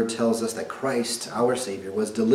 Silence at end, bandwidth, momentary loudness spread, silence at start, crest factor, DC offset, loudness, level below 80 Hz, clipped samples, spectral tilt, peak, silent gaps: 0 s; 16 kHz; 5 LU; 0 s; 18 dB; under 0.1%; -26 LUFS; -68 dBFS; under 0.1%; -4 dB/octave; -6 dBFS; none